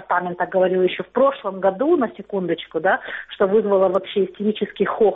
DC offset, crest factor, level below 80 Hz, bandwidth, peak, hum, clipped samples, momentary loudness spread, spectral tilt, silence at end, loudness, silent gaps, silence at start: under 0.1%; 14 dB; -62 dBFS; 4 kHz; -6 dBFS; none; under 0.1%; 6 LU; -4 dB/octave; 0 s; -20 LUFS; none; 0 s